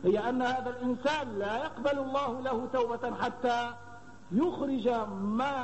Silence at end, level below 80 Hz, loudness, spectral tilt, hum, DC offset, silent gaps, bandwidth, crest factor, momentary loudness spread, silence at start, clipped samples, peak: 0 s; -62 dBFS; -32 LUFS; -6 dB/octave; none; 0.3%; none; 8.4 kHz; 14 dB; 4 LU; 0 s; under 0.1%; -16 dBFS